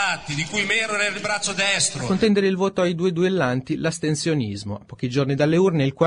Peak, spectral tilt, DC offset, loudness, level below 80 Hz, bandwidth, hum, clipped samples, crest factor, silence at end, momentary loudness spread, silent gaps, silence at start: -6 dBFS; -4.5 dB/octave; under 0.1%; -21 LUFS; -54 dBFS; 10.5 kHz; none; under 0.1%; 16 dB; 0 s; 7 LU; none; 0 s